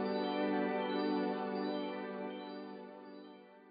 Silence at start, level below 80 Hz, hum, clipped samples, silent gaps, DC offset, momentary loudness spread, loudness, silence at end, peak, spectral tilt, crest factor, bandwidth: 0 s; under -90 dBFS; none; under 0.1%; none; under 0.1%; 17 LU; -38 LUFS; 0 s; -24 dBFS; -4 dB/octave; 14 dB; 5 kHz